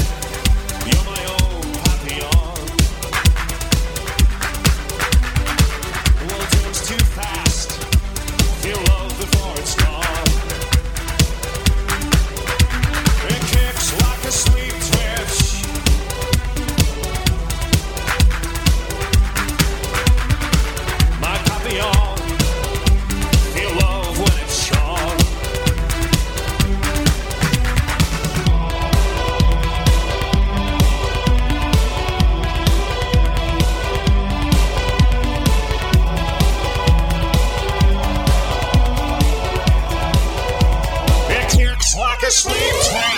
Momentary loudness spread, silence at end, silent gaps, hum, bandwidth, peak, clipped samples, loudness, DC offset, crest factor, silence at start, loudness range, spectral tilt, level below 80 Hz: 3 LU; 0 s; none; none; 17.5 kHz; -2 dBFS; under 0.1%; -18 LUFS; under 0.1%; 14 dB; 0 s; 2 LU; -4 dB/octave; -18 dBFS